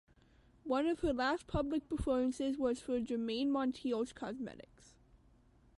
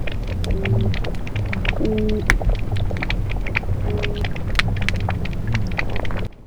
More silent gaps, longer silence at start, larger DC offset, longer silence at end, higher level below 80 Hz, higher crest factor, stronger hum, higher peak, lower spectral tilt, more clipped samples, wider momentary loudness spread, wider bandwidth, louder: neither; first, 0.65 s vs 0 s; neither; first, 1.15 s vs 0 s; second, -54 dBFS vs -26 dBFS; about the same, 16 dB vs 20 dB; neither; second, -22 dBFS vs 0 dBFS; about the same, -6 dB/octave vs -6 dB/octave; neither; first, 9 LU vs 6 LU; second, 11.5 kHz vs 16 kHz; second, -37 LUFS vs -23 LUFS